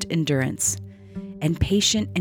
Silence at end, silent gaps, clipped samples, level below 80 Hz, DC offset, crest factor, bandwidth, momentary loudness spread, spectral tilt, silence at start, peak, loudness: 0 s; none; under 0.1%; -42 dBFS; under 0.1%; 18 dB; 19 kHz; 18 LU; -4 dB/octave; 0 s; -6 dBFS; -22 LUFS